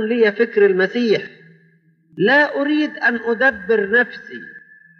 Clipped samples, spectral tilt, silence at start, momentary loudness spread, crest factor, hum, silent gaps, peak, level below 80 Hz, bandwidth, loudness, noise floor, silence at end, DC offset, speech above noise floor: under 0.1%; -6.5 dB/octave; 0 s; 12 LU; 16 dB; none; none; -4 dBFS; -64 dBFS; 6.6 kHz; -17 LUFS; -56 dBFS; 0.4 s; under 0.1%; 39 dB